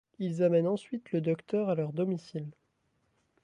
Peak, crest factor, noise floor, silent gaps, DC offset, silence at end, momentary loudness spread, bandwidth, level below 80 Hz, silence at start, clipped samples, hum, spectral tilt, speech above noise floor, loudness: -16 dBFS; 16 dB; -75 dBFS; none; under 0.1%; 0.95 s; 13 LU; 10 kHz; -78 dBFS; 0.2 s; under 0.1%; none; -8.5 dB/octave; 45 dB; -31 LUFS